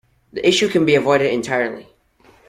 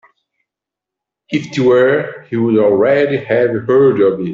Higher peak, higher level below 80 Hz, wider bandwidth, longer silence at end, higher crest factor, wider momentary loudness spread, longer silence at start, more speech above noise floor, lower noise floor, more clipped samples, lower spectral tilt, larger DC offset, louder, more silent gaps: about the same, -2 dBFS vs -2 dBFS; about the same, -56 dBFS vs -58 dBFS; first, 14 kHz vs 7.4 kHz; first, 0.65 s vs 0 s; about the same, 16 dB vs 12 dB; first, 13 LU vs 9 LU; second, 0.35 s vs 1.3 s; second, 36 dB vs 71 dB; second, -53 dBFS vs -84 dBFS; neither; second, -4.5 dB/octave vs -7.5 dB/octave; neither; second, -17 LUFS vs -13 LUFS; neither